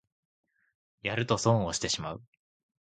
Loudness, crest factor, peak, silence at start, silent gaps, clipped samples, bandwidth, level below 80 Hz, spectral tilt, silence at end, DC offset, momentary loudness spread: -29 LUFS; 24 dB; -10 dBFS; 1.05 s; none; under 0.1%; 9.4 kHz; -58 dBFS; -4.5 dB/octave; 0.65 s; under 0.1%; 13 LU